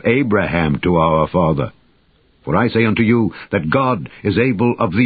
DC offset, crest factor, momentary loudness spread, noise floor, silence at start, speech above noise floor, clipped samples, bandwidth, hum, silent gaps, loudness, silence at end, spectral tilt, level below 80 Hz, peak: under 0.1%; 14 dB; 6 LU; -56 dBFS; 0.05 s; 40 dB; under 0.1%; 4.9 kHz; none; none; -16 LUFS; 0 s; -12.5 dB/octave; -38 dBFS; -2 dBFS